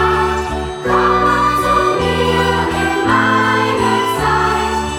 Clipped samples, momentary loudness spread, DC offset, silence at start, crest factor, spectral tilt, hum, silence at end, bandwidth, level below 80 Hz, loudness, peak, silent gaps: under 0.1%; 4 LU; under 0.1%; 0 s; 12 dB; -5 dB/octave; none; 0 s; 17.5 kHz; -30 dBFS; -14 LUFS; -2 dBFS; none